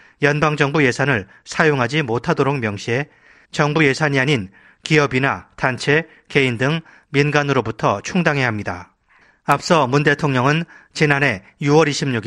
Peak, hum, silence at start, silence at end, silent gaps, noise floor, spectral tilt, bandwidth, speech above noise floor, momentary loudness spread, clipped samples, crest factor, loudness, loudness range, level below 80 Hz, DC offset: 0 dBFS; none; 0.2 s; 0 s; none; -55 dBFS; -5.5 dB/octave; 12 kHz; 37 dB; 8 LU; under 0.1%; 18 dB; -18 LUFS; 1 LU; -52 dBFS; under 0.1%